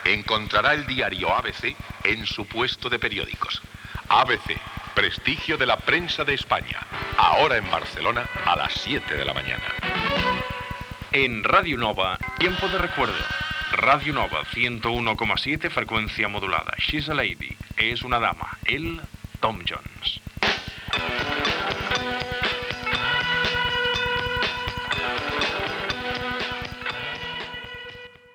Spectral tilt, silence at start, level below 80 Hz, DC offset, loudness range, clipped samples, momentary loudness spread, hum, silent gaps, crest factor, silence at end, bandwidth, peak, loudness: -4.5 dB/octave; 0 s; -44 dBFS; under 0.1%; 4 LU; under 0.1%; 10 LU; none; none; 22 dB; 0.25 s; 19 kHz; -4 dBFS; -24 LUFS